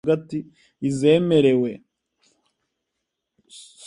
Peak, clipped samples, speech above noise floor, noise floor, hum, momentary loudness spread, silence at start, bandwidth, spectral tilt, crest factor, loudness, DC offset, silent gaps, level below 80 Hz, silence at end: -4 dBFS; under 0.1%; 60 dB; -80 dBFS; none; 16 LU; 0.05 s; 11 kHz; -7 dB/octave; 18 dB; -21 LUFS; under 0.1%; none; -64 dBFS; 0 s